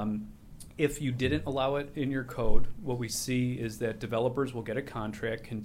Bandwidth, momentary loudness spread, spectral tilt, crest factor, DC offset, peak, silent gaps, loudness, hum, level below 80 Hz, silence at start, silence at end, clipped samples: 15.5 kHz; 7 LU; -5.5 dB/octave; 20 dB; under 0.1%; -8 dBFS; none; -32 LUFS; none; -40 dBFS; 0 s; 0 s; under 0.1%